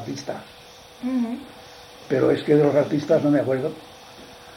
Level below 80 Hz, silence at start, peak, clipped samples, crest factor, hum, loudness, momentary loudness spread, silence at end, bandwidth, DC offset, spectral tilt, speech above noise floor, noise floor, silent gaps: -60 dBFS; 0 s; -6 dBFS; under 0.1%; 18 dB; none; -22 LUFS; 24 LU; 0 s; 16 kHz; under 0.1%; -7 dB/octave; 22 dB; -44 dBFS; none